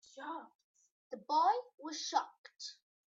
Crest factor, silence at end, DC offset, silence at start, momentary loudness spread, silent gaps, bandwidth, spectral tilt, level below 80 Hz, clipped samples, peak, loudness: 20 dB; 0.35 s; under 0.1%; 0.15 s; 18 LU; 0.55-0.74 s, 0.91-1.10 s, 2.38-2.44 s; 8 kHz; -1 dB/octave; under -90 dBFS; under 0.1%; -18 dBFS; -36 LUFS